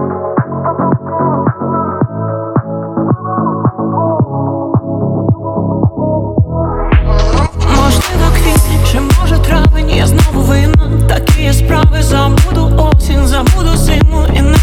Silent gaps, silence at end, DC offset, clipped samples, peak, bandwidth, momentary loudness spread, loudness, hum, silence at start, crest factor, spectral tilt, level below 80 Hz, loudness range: none; 0 s; under 0.1%; under 0.1%; 0 dBFS; 16.5 kHz; 6 LU; -12 LUFS; none; 0 s; 10 dB; -6 dB/octave; -14 dBFS; 5 LU